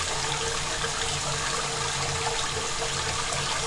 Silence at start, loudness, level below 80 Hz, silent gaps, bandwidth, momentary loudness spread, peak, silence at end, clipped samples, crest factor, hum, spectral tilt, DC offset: 0 s; -27 LUFS; -44 dBFS; none; 11.5 kHz; 1 LU; -12 dBFS; 0 s; under 0.1%; 16 dB; none; -1.5 dB/octave; under 0.1%